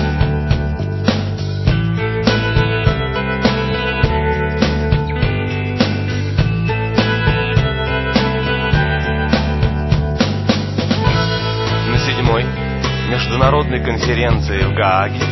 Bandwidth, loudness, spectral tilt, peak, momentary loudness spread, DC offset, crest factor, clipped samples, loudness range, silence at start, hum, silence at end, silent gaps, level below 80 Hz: 6.2 kHz; -16 LUFS; -6.5 dB/octave; 0 dBFS; 4 LU; under 0.1%; 16 dB; under 0.1%; 1 LU; 0 s; none; 0 s; none; -24 dBFS